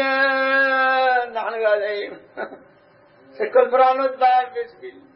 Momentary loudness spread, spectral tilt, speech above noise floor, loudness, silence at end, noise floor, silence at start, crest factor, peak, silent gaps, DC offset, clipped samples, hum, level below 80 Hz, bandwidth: 17 LU; -7 dB/octave; 32 dB; -19 LUFS; 0.25 s; -52 dBFS; 0 s; 18 dB; -2 dBFS; none; under 0.1%; under 0.1%; none; -74 dBFS; 5.8 kHz